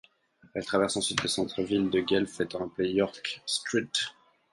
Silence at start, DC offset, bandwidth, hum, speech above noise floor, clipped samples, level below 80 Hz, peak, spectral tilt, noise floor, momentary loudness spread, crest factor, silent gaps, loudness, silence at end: 0.55 s; under 0.1%; 11.5 kHz; none; 32 dB; under 0.1%; -62 dBFS; -8 dBFS; -3.5 dB/octave; -61 dBFS; 7 LU; 22 dB; none; -29 LUFS; 0.4 s